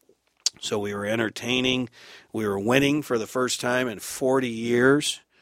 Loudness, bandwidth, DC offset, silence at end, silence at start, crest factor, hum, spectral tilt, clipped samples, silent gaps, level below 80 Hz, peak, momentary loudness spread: -24 LUFS; 16 kHz; under 0.1%; 0.25 s; 0.45 s; 22 dB; none; -4 dB/octave; under 0.1%; none; -60 dBFS; -2 dBFS; 8 LU